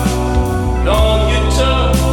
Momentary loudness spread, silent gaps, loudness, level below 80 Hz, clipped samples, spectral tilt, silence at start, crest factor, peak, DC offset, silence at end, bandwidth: 3 LU; none; -14 LUFS; -16 dBFS; under 0.1%; -5.5 dB/octave; 0 s; 12 dB; 0 dBFS; under 0.1%; 0 s; 17 kHz